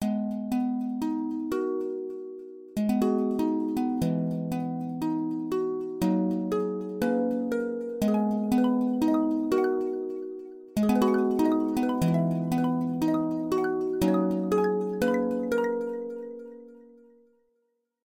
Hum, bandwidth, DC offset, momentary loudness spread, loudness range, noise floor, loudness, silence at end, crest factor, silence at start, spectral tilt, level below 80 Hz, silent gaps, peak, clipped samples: none; 16.5 kHz; under 0.1%; 9 LU; 3 LU; -76 dBFS; -27 LUFS; 1.2 s; 16 dB; 0 s; -7.5 dB/octave; -58 dBFS; none; -12 dBFS; under 0.1%